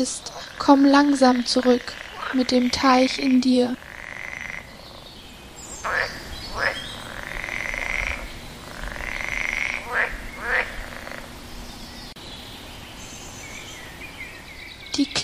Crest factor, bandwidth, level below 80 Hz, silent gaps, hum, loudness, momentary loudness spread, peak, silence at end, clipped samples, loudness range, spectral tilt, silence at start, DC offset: 22 dB; 15.5 kHz; -42 dBFS; none; none; -22 LUFS; 20 LU; -2 dBFS; 0 s; under 0.1%; 17 LU; -3.5 dB/octave; 0 s; under 0.1%